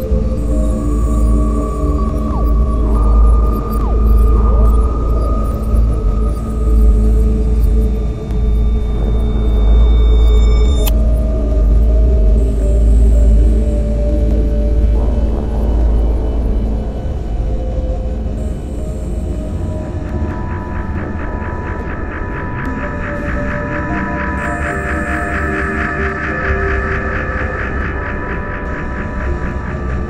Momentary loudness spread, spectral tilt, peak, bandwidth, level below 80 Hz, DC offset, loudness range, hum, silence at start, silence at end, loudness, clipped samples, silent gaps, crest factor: 9 LU; -8 dB/octave; -2 dBFS; 12.5 kHz; -14 dBFS; under 0.1%; 8 LU; none; 0 s; 0 s; -16 LUFS; under 0.1%; none; 12 dB